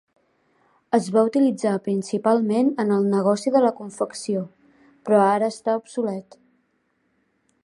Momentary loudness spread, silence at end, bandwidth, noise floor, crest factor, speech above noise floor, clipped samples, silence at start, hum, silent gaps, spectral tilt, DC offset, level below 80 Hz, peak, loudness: 10 LU; 1.4 s; 11.5 kHz; -69 dBFS; 18 dB; 48 dB; under 0.1%; 0.9 s; none; none; -6.5 dB/octave; under 0.1%; -74 dBFS; -4 dBFS; -22 LUFS